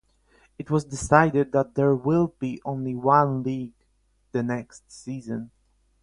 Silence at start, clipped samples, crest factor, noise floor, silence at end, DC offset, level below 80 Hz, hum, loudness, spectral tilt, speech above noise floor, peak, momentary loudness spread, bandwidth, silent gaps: 0.6 s; under 0.1%; 24 dB; -66 dBFS; 0.55 s; under 0.1%; -52 dBFS; none; -24 LUFS; -7 dB/octave; 43 dB; -2 dBFS; 18 LU; 11 kHz; none